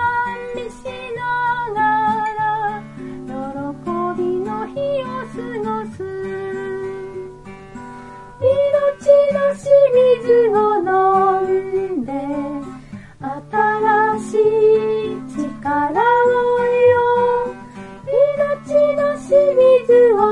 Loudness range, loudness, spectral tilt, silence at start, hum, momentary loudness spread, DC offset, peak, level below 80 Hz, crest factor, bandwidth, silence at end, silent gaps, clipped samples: 9 LU; -17 LUFS; -6.5 dB/octave; 0 s; none; 17 LU; under 0.1%; -2 dBFS; -50 dBFS; 16 dB; 11 kHz; 0 s; none; under 0.1%